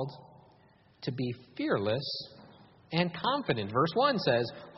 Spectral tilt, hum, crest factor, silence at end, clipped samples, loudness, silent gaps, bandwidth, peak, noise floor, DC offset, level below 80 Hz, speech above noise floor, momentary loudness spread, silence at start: -4 dB/octave; none; 20 dB; 0 s; under 0.1%; -31 LUFS; none; 6 kHz; -12 dBFS; -62 dBFS; under 0.1%; -68 dBFS; 31 dB; 13 LU; 0 s